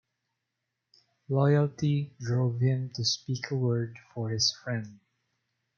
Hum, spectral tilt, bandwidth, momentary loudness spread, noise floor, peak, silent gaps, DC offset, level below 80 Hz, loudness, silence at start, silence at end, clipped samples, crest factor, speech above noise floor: none; -5.5 dB/octave; 7.2 kHz; 11 LU; -84 dBFS; -12 dBFS; none; under 0.1%; -70 dBFS; -29 LUFS; 1.3 s; 0.8 s; under 0.1%; 18 dB; 56 dB